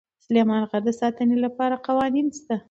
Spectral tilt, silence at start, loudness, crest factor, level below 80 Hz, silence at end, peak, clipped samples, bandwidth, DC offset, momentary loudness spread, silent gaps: -6 dB/octave; 0.3 s; -23 LUFS; 16 dB; -64 dBFS; 0.1 s; -6 dBFS; under 0.1%; 8 kHz; under 0.1%; 5 LU; none